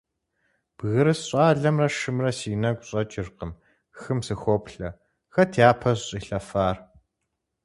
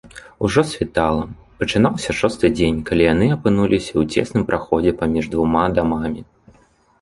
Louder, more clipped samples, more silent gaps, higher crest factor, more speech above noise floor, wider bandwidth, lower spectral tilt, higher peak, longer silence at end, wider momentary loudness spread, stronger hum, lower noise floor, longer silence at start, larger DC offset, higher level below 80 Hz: second, -24 LUFS vs -19 LUFS; neither; neither; first, 24 dB vs 18 dB; first, 56 dB vs 37 dB; about the same, 11.5 kHz vs 11.5 kHz; about the same, -6 dB/octave vs -6.5 dB/octave; about the same, -2 dBFS vs -2 dBFS; about the same, 0.8 s vs 0.8 s; first, 17 LU vs 7 LU; neither; first, -80 dBFS vs -55 dBFS; first, 0.8 s vs 0.05 s; neither; second, -50 dBFS vs -38 dBFS